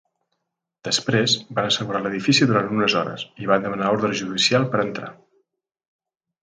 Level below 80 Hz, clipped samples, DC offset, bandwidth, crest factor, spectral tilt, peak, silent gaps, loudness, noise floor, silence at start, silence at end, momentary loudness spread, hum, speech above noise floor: -62 dBFS; under 0.1%; under 0.1%; 9.6 kHz; 20 dB; -4 dB/octave; -2 dBFS; none; -21 LUFS; -79 dBFS; 0.85 s; 1.3 s; 11 LU; none; 58 dB